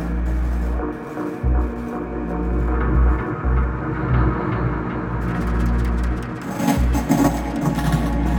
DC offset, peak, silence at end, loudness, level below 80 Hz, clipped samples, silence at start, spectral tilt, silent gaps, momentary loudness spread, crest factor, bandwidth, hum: under 0.1%; -2 dBFS; 0 s; -22 LUFS; -22 dBFS; under 0.1%; 0 s; -7.5 dB/octave; none; 7 LU; 18 dB; 18 kHz; none